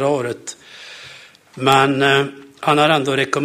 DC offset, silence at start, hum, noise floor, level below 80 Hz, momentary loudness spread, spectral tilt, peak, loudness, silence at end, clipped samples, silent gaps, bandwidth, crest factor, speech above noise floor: under 0.1%; 0 s; none; -42 dBFS; -58 dBFS; 22 LU; -4.5 dB/octave; 0 dBFS; -16 LUFS; 0 s; under 0.1%; none; 15.5 kHz; 18 dB; 26 dB